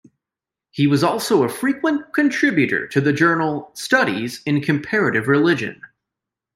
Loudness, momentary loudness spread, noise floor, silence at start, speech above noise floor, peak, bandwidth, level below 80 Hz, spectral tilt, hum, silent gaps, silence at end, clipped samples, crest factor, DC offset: -18 LUFS; 6 LU; -88 dBFS; 0.75 s; 69 dB; -2 dBFS; 16 kHz; -62 dBFS; -5.5 dB/octave; none; none; 0.7 s; under 0.1%; 16 dB; under 0.1%